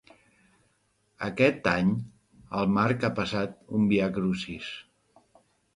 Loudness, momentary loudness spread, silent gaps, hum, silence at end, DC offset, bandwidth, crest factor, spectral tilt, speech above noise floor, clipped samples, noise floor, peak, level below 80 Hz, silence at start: -27 LUFS; 12 LU; none; none; 0.95 s; under 0.1%; 11 kHz; 20 dB; -7 dB/octave; 44 dB; under 0.1%; -71 dBFS; -8 dBFS; -58 dBFS; 1.2 s